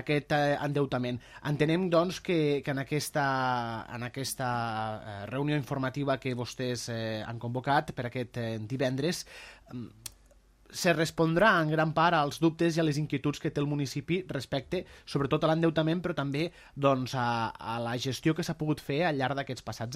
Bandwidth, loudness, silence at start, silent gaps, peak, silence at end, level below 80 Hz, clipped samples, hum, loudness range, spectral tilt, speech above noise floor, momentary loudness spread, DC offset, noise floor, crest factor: 15.5 kHz; -30 LUFS; 0 s; none; -10 dBFS; 0 s; -60 dBFS; under 0.1%; none; 6 LU; -5.5 dB/octave; 30 dB; 11 LU; under 0.1%; -60 dBFS; 20 dB